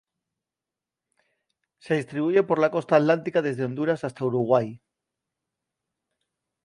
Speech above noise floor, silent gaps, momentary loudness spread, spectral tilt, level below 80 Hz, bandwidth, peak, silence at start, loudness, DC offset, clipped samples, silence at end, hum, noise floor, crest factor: 66 dB; none; 7 LU; -7.5 dB/octave; -72 dBFS; 11 kHz; -4 dBFS; 1.85 s; -24 LUFS; under 0.1%; under 0.1%; 1.85 s; none; -89 dBFS; 22 dB